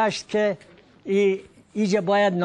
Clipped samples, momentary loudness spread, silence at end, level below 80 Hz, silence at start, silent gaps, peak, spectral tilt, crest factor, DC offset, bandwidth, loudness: under 0.1%; 14 LU; 0 s; -66 dBFS; 0 s; none; -8 dBFS; -5.5 dB/octave; 14 dB; under 0.1%; 10 kHz; -23 LUFS